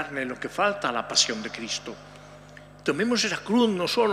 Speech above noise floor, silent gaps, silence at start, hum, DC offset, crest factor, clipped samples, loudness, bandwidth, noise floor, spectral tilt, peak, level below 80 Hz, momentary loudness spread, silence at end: 21 dB; none; 0 s; 50 Hz at -50 dBFS; under 0.1%; 20 dB; under 0.1%; -25 LUFS; 14.5 kHz; -47 dBFS; -2.5 dB/octave; -8 dBFS; -60 dBFS; 10 LU; 0 s